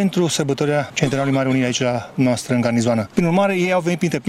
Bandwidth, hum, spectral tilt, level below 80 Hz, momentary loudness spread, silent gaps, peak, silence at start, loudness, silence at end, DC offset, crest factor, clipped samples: 15.5 kHz; none; -5.5 dB/octave; -52 dBFS; 3 LU; none; -4 dBFS; 0 s; -19 LUFS; 0 s; under 0.1%; 14 dB; under 0.1%